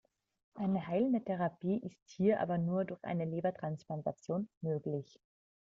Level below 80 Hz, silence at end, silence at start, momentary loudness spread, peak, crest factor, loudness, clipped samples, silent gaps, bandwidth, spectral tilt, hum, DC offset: -74 dBFS; 0.65 s; 0.55 s; 8 LU; -18 dBFS; 18 dB; -36 LUFS; under 0.1%; 2.02-2.06 s, 4.57-4.61 s; 7.4 kHz; -8 dB/octave; none; under 0.1%